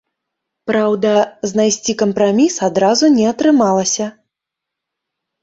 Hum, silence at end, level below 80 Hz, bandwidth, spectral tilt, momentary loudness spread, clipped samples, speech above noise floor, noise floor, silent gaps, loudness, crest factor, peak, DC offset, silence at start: none; 1.35 s; -58 dBFS; 8 kHz; -4 dB/octave; 7 LU; under 0.1%; 68 dB; -82 dBFS; none; -14 LUFS; 14 dB; -2 dBFS; under 0.1%; 0.65 s